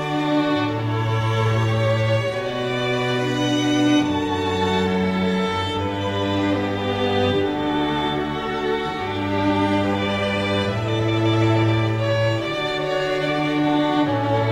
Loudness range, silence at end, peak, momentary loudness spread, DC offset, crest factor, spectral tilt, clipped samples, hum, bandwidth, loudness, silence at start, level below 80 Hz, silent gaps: 2 LU; 0 s; -6 dBFS; 4 LU; under 0.1%; 14 dB; -6.5 dB/octave; under 0.1%; none; 11.5 kHz; -21 LUFS; 0 s; -48 dBFS; none